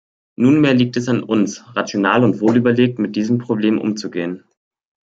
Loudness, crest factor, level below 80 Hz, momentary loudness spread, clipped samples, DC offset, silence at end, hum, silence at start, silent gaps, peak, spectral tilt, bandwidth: -17 LUFS; 16 dB; -60 dBFS; 10 LU; under 0.1%; under 0.1%; 0.65 s; none; 0.4 s; none; -2 dBFS; -6.5 dB/octave; 7.8 kHz